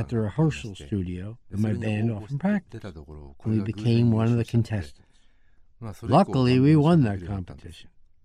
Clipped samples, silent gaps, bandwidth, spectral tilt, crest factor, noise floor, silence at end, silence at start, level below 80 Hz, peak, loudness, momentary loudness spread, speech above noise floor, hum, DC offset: under 0.1%; none; 10.5 kHz; -8.5 dB/octave; 16 dB; -55 dBFS; 0.35 s; 0 s; -50 dBFS; -8 dBFS; -24 LUFS; 21 LU; 31 dB; none; under 0.1%